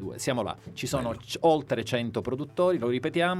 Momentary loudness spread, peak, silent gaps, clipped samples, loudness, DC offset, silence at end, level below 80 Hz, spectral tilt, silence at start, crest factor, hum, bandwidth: 8 LU; -12 dBFS; none; under 0.1%; -28 LUFS; under 0.1%; 0 s; -56 dBFS; -5 dB/octave; 0 s; 16 dB; none; 15.5 kHz